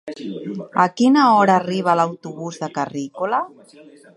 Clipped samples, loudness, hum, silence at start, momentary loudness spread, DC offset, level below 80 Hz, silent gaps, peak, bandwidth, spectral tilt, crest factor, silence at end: under 0.1%; -18 LUFS; none; 0.05 s; 17 LU; under 0.1%; -72 dBFS; none; -2 dBFS; 11 kHz; -6 dB/octave; 18 dB; 0.7 s